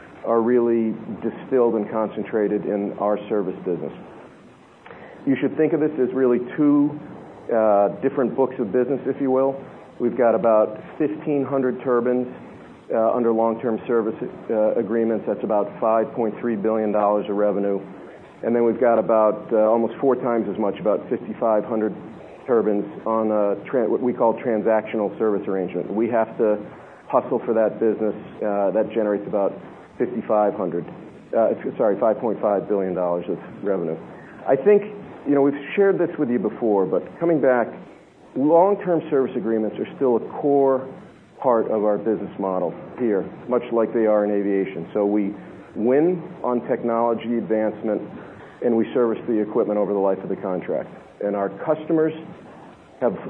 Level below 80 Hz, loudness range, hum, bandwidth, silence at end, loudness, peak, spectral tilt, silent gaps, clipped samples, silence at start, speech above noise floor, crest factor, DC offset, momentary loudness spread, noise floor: -68 dBFS; 3 LU; none; 4 kHz; 0 s; -22 LUFS; -4 dBFS; -10.5 dB/octave; none; under 0.1%; 0 s; 27 dB; 18 dB; under 0.1%; 10 LU; -48 dBFS